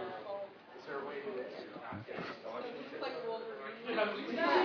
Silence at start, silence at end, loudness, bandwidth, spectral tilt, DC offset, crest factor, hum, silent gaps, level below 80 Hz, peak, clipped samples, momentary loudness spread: 0 s; 0 s; -40 LUFS; 5.4 kHz; -2 dB/octave; under 0.1%; 22 dB; none; none; -82 dBFS; -18 dBFS; under 0.1%; 11 LU